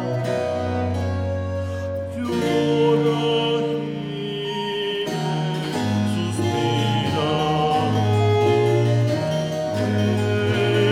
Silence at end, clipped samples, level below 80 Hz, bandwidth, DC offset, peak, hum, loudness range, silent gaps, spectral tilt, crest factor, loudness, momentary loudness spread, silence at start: 0 s; under 0.1%; -52 dBFS; 14 kHz; under 0.1%; -6 dBFS; none; 3 LU; none; -6.5 dB/octave; 14 dB; -22 LUFS; 8 LU; 0 s